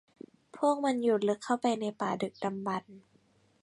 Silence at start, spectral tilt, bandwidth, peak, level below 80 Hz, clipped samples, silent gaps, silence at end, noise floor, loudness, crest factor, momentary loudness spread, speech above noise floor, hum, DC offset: 0.55 s; -5.5 dB/octave; 11.5 kHz; -14 dBFS; -78 dBFS; under 0.1%; none; 0.65 s; -67 dBFS; -31 LUFS; 18 dB; 8 LU; 37 dB; none; under 0.1%